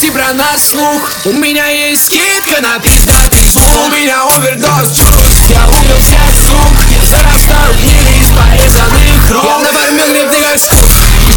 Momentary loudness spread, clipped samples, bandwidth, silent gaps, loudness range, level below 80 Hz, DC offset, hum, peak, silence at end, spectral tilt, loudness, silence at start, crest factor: 4 LU; 4%; over 20 kHz; none; 1 LU; -8 dBFS; under 0.1%; none; 0 dBFS; 0 s; -3.5 dB/octave; -6 LUFS; 0 s; 6 dB